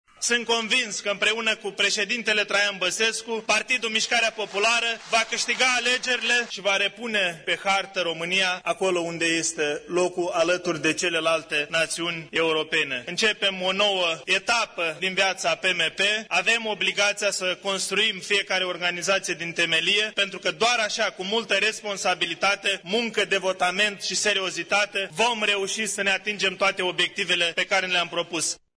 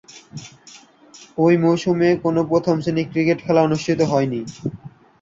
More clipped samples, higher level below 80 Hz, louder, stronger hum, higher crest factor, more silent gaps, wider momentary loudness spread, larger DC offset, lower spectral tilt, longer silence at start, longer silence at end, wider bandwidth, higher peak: neither; second, -66 dBFS vs -56 dBFS; second, -23 LUFS vs -19 LUFS; neither; about the same, 16 dB vs 16 dB; neither; second, 4 LU vs 19 LU; neither; second, -1.5 dB/octave vs -7 dB/octave; about the same, 0.2 s vs 0.15 s; second, 0.2 s vs 0.35 s; first, 11 kHz vs 7.6 kHz; second, -8 dBFS vs -4 dBFS